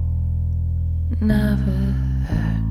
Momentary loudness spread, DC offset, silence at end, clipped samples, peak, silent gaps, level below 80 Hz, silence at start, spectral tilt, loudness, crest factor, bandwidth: 4 LU; under 0.1%; 0 s; under 0.1%; -8 dBFS; none; -24 dBFS; 0 s; -9 dB/octave; -22 LUFS; 12 dB; 12.5 kHz